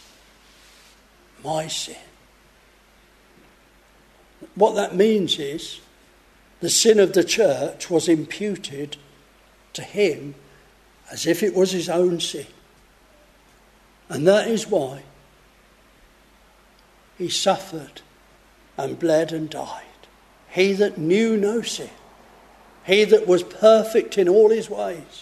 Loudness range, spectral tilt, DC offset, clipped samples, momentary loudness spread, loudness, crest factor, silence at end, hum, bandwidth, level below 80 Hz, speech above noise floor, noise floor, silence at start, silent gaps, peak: 10 LU; -4 dB/octave; under 0.1%; under 0.1%; 21 LU; -20 LUFS; 22 dB; 0 s; none; 13.5 kHz; -60 dBFS; 34 dB; -54 dBFS; 1.45 s; none; 0 dBFS